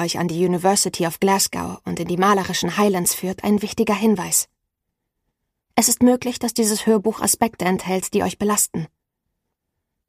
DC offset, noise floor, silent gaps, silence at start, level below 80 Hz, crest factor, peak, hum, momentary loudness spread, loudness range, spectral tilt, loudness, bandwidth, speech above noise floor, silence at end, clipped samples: under 0.1%; -79 dBFS; none; 0 s; -54 dBFS; 20 dB; -2 dBFS; none; 6 LU; 2 LU; -3.5 dB/octave; -19 LUFS; 15.5 kHz; 59 dB; 1.2 s; under 0.1%